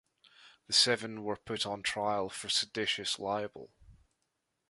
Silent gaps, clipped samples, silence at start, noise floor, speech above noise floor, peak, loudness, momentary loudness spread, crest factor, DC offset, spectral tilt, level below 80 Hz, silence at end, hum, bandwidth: none; under 0.1%; 0.4 s; -82 dBFS; 49 dB; -14 dBFS; -32 LUFS; 12 LU; 22 dB; under 0.1%; -2 dB/octave; -68 dBFS; 0.75 s; none; 11.5 kHz